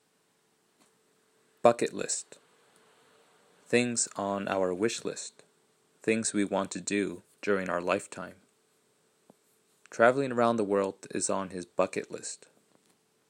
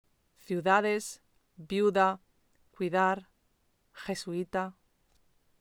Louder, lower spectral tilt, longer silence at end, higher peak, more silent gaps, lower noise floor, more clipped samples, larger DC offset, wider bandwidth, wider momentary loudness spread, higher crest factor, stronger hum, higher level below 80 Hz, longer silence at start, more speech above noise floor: about the same, -30 LUFS vs -30 LUFS; second, -3.5 dB/octave vs -5 dB/octave; about the same, 0.95 s vs 0.9 s; first, -6 dBFS vs -10 dBFS; neither; about the same, -71 dBFS vs -72 dBFS; neither; neither; second, 15.5 kHz vs 18 kHz; about the same, 15 LU vs 16 LU; about the same, 26 dB vs 22 dB; neither; second, -78 dBFS vs -70 dBFS; first, 1.65 s vs 0.5 s; about the same, 41 dB vs 43 dB